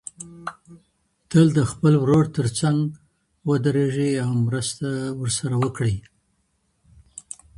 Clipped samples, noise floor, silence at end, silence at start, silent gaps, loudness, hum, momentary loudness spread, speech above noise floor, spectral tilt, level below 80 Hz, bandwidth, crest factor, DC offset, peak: under 0.1%; -69 dBFS; 0.4 s; 0.2 s; none; -22 LUFS; none; 19 LU; 49 dB; -6.5 dB/octave; -50 dBFS; 11.5 kHz; 20 dB; under 0.1%; -4 dBFS